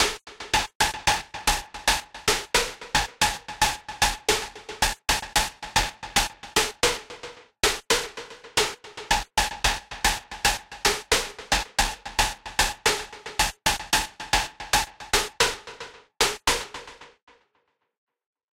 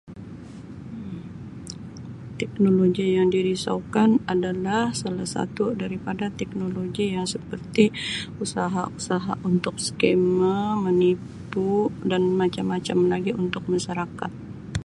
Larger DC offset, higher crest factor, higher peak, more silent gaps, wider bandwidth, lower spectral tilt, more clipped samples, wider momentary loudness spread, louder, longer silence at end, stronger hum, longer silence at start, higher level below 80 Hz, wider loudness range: neither; about the same, 18 dB vs 20 dB; second, -8 dBFS vs -4 dBFS; first, 0.75-0.80 s vs none; first, 16.5 kHz vs 11.5 kHz; second, -1 dB/octave vs -6 dB/octave; neither; second, 8 LU vs 17 LU; about the same, -24 LUFS vs -24 LUFS; first, 1.5 s vs 0.05 s; neither; about the same, 0 s vs 0.05 s; first, -40 dBFS vs -52 dBFS; second, 1 LU vs 4 LU